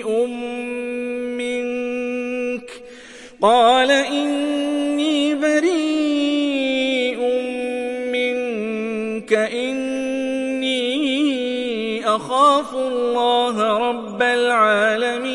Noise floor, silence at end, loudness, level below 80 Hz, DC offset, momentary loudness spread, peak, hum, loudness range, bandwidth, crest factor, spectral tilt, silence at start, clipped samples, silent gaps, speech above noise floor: -40 dBFS; 0 s; -19 LUFS; -60 dBFS; under 0.1%; 10 LU; -2 dBFS; none; 5 LU; 11.5 kHz; 16 dB; -3.5 dB/octave; 0 s; under 0.1%; none; 23 dB